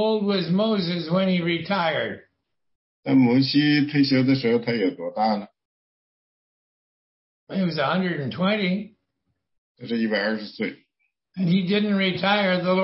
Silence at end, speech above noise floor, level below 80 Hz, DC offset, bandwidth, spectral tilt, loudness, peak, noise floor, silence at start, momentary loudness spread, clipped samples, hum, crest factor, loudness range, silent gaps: 0 s; 55 dB; -68 dBFS; under 0.1%; 5.8 kHz; -10 dB/octave; -22 LUFS; -8 dBFS; -77 dBFS; 0 s; 11 LU; under 0.1%; none; 16 dB; 7 LU; 2.75-3.03 s, 5.65-7.47 s, 9.58-9.75 s